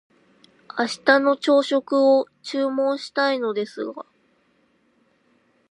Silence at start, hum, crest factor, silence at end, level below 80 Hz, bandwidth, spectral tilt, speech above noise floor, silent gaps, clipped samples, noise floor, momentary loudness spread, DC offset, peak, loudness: 0.75 s; none; 22 dB; 1.7 s; -80 dBFS; 11.5 kHz; -3.5 dB/octave; 43 dB; none; under 0.1%; -64 dBFS; 13 LU; under 0.1%; -2 dBFS; -21 LUFS